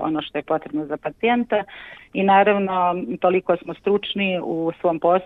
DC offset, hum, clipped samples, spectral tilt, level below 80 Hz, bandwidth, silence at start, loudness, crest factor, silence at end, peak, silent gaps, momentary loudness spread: under 0.1%; none; under 0.1%; -8.5 dB/octave; -60 dBFS; 4.3 kHz; 0 s; -21 LUFS; 16 dB; 0 s; -4 dBFS; none; 10 LU